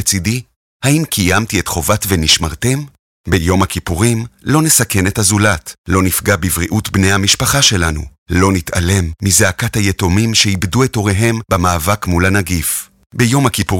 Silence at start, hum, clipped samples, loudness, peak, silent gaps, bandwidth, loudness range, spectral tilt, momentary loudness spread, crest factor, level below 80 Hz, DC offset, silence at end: 0 s; none; under 0.1%; -13 LUFS; 0 dBFS; 0.56-0.80 s, 2.99-3.24 s, 5.78-5.84 s, 8.18-8.26 s, 13.06-13.10 s; 17 kHz; 2 LU; -4 dB/octave; 7 LU; 14 dB; -32 dBFS; under 0.1%; 0 s